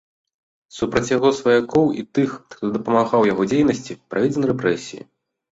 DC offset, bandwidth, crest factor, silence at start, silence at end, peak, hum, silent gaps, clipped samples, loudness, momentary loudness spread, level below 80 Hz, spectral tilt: under 0.1%; 8 kHz; 18 dB; 0.75 s; 0.6 s; -2 dBFS; none; none; under 0.1%; -20 LUFS; 11 LU; -54 dBFS; -6 dB/octave